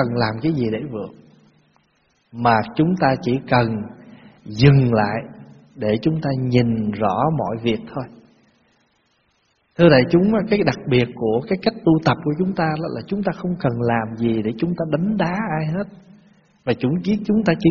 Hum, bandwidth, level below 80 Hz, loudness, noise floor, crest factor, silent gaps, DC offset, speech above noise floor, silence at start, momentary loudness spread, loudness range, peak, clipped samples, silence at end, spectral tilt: none; 6.8 kHz; -48 dBFS; -20 LUFS; -64 dBFS; 20 dB; none; under 0.1%; 46 dB; 0 s; 13 LU; 4 LU; 0 dBFS; under 0.1%; 0 s; -6 dB/octave